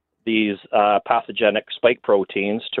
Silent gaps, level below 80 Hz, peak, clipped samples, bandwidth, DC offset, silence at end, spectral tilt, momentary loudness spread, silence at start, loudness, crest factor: none; -64 dBFS; -4 dBFS; under 0.1%; 4.3 kHz; under 0.1%; 0 s; -9.5 dB/octave; 5 LU; 0.25 s; -20 LUFS; 16 dB